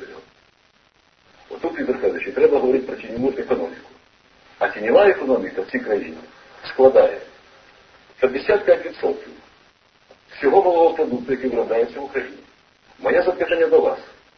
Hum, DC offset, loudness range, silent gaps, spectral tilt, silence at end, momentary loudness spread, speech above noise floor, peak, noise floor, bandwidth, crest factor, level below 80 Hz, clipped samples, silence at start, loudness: none; under 0.1%; 4 LU; none; -6.5 dB/octave; 0.35 s; 16 LU; 40 dB; 0 dBFS; -58 dBFS; 6.4 kHz; 20 dB; -56 dBFS; under 0.1%; 0 s; -19 LUFS